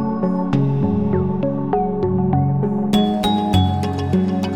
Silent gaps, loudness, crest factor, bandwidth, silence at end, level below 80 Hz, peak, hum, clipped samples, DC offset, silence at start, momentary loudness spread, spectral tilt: none; -19 LUFS; 14 dB; 15.5 kHz; 0 s; -40 dBFS; -4 dBFS; none; under 0.1%; 1%; 0 s; 3 LU; -8 dB/octave